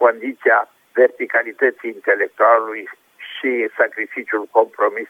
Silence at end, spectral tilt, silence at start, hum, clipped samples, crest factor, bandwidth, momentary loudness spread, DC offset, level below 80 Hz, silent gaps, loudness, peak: 0.05 s; -4.5 dB/octave; 0 s; none; under 0.1%; 18 dB; 15 kHz; 12 LU; under 0.1%; -82 dBFS; none; -18 LUFS; 0 dBFS